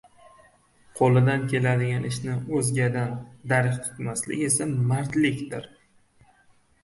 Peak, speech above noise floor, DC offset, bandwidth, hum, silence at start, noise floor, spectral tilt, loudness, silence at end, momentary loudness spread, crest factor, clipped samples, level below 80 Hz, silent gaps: -8 dBFS; 36 dB; under 0.1%; 11.5 kHz; none; 0.95 s; -60 dBFS; -5.5 dB/octave; -25 LUFS; 1.15 s; 11 LU; 18 dB; under 0.1%; -58 dBFS; none